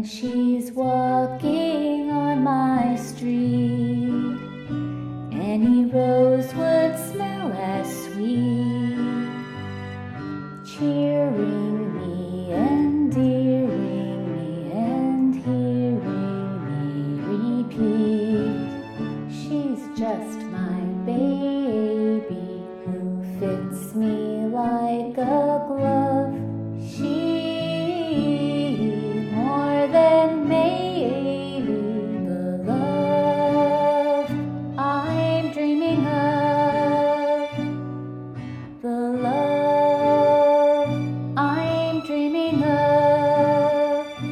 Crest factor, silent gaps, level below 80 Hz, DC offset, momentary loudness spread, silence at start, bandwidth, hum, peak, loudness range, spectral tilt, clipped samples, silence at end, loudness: 16 dB; none; -60 dBFS; under 0.1%; 11 LU; 0 s; 14.5 kHz; none; -6 dBFS; 5 LU; -7.5 dB/octave; under 0.1%; 0 s; -22 LUFS